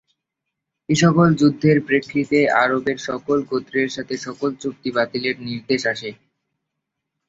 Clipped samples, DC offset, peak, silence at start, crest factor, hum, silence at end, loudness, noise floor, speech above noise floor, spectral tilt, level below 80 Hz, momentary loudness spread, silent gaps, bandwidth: under 0.1%; under 0.1%; -2 dBFS; 0.9 s; 18 dB; none; 1.15 s; -20 LUFS; -81 dBFS; 61 dB; -6 dB/octave; -58 dBFS; 12 LU; none; 7.8 kHz